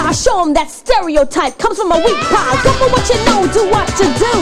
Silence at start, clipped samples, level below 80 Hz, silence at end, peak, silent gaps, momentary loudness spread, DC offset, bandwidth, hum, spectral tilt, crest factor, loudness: 0 s; under 0.1%; -28 dBFS; 0 s; 0 dBFS; none; 4 LU; under 0.1%; 15.5 kHz; none; -4 dB/octave; 12 dB; -12 LUFS